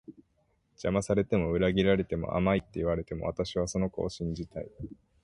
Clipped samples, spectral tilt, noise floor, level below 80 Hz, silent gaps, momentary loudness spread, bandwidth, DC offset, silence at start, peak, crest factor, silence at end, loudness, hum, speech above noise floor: under 0.1%; -6.5 dB/octave; -72 dBFS; -48 dBFS; none; 13 LU; 11.5 kHz; under 0.1%; 0.1 s; -12 dBFS; 18 dB; 0.35 s; -30 LUFS; none; 42 dB